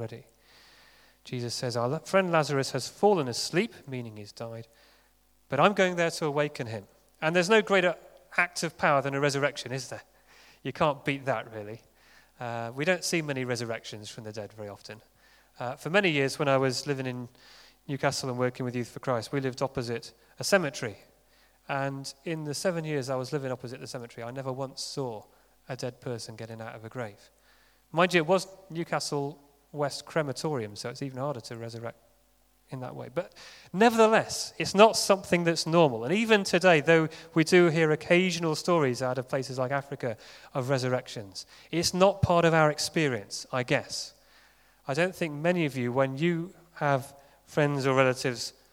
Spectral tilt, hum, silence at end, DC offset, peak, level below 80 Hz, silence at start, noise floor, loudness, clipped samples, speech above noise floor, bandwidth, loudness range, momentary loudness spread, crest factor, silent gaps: -4.5 dB/octave; none; 0.25 s; under 0.1%; -2 dBFS; -64 dBFS; 0 s; -66 dBFS; -28 LUFS; under 0.1%; 38 dB; 19.5 kHz; 10 LU; 18 LU; 26 dB; none